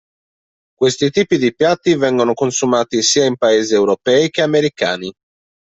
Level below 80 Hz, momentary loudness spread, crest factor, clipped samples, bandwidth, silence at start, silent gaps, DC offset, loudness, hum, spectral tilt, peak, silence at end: -56 dBFS; 4 LU; 14 dB; under 0.1%; 8.2 kHz; 0.8 s; none; under 0.1%; -15 LUFS; none; -4 dB/octave; -2 dBFS; 0.55 s